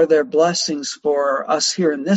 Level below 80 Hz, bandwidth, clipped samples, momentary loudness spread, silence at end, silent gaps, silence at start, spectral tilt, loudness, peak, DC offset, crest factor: -66 dBFS; 8.8 kHz; under 0.1%; 6 LU; 0 s; none; 0 s; -3.5 dB/octave; -18 LUFS; -4 dBFS; under 0.1%; 14 dB